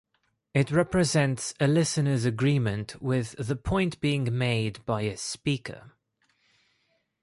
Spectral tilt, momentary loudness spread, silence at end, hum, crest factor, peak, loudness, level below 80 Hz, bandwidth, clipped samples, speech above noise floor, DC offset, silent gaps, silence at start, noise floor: -5.5 dB/octave; 8 LU; 1.35 s; none; 16 dB; -12 dBFS; -27 LUFS; -50 dBFS; 11.5 kHz; under 0.1%; 46 dB; under 0.1%; none; 0.55 s; -73 dBFS